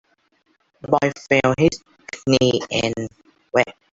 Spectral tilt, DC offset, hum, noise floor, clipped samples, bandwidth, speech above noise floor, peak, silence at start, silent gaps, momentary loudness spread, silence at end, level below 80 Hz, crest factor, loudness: -5 dB/octave; under 0.1%; none; -65 dBFS; under 0.1%; 8 kHz; 46 dB; -2 dBFS; 0.85 s; none; 17 LU; 0.2 s; -52 dBFS; 20 dB; -20 LUFS